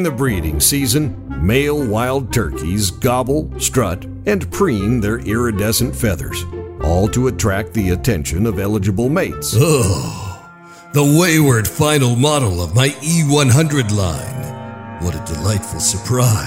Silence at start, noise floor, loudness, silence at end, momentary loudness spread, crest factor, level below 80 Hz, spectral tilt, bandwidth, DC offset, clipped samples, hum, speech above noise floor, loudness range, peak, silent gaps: 0 s; -39 dBFS; -16 LUFS; 0 s; 11 LU; 14 dB; -32 dBFS; -5 dB/octave; 16 kHz; under 0.1%; under 0.1%; none; 23 dB; 4 LU; -2 dBFS; none